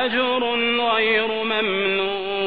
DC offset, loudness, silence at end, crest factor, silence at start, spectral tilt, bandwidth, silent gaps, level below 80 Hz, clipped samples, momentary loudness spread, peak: 0.5%; -20 LUFS; 0 s; 14 dB; 0 s; -6.5 dB/octave; 5.2 kHz; none; -58 dBFS; under 0.1%; 4 LU; -8 dBFS